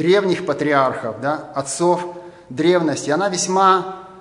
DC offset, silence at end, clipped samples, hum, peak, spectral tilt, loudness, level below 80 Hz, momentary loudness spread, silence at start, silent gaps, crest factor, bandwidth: under 0.1%; 0 s; under 0.1%; none; -2 dBFS; -4.5 dB/octave; -18 LUFS; -62 dBFS; 11 LU; 0 s; none; 18 dB; 11 kHz